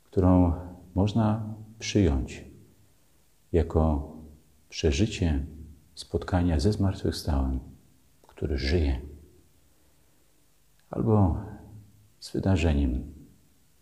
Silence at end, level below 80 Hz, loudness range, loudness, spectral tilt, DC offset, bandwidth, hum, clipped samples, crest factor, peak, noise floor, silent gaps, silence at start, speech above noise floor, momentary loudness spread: 0.6 s; -36 dBFS; 4 LU; -27 LUFS; -7 dB/octave; under 0.1%; 12.5 kHz; none; under 0.1%; 20 dB; -8 dBFS; -66 dBFS; none; 0.15 s; 40 dB; 19 LU